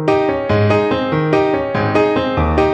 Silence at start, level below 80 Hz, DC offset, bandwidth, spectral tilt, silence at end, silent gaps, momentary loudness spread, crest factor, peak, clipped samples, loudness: 0 s; -30 dBFS; under 0.1%; 8.2 kHz; -8 dB/octave; 0 s; none; 2 LU; 14 dB; 0 dBFS; under 0.1%; -15 LUFS